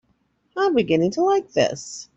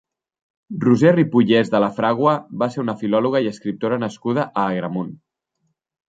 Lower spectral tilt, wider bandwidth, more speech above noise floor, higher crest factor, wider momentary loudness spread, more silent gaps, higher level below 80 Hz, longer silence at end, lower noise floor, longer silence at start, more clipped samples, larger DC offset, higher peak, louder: second, -5 dB/octave vs -7.5 dB/octave; about the same, 8.2 kHz vs 7.8 kHz; second, 46 dB vs 54 dB; about the same, 16 dB vs 18 dB; about the same, 9 LU vs 10 LU; neither; about the same, -58 dBFS vs -62 dBFS; second, 0.15 s vs 0.95 s; second, -67 dBFS vs -72 dBFS; second, 0.55 s vs 0.7 s; neither; neither; second, -6 dBFS vs -2 dBFS; about the same, -21 LUFS vs -19 LUFS